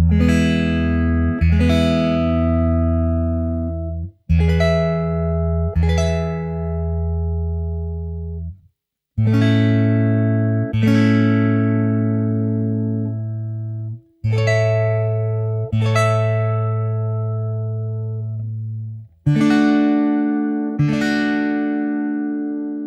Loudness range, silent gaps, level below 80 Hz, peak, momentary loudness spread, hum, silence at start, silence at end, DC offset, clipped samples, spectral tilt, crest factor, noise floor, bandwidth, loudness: 5 LU; none; -30 dBFS; -4 dBFS; 11 LU; none; 0 s; 0 s; under 0.1%; under 0.1%; -8 dB/octave; 14 dB; -69 dBFS; 9.8 kHz; -19 LUFS